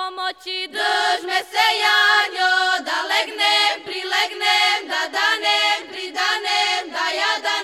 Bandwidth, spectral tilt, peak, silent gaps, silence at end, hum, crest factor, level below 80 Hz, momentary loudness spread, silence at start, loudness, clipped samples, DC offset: 16 kHz; 1.5 dB/octave; -2 dBFS; none; 0 s; none; 18 dB; -72 dBFS; 8 LU; 0 s; -18 LUFS; under 0.1%; under 0.1%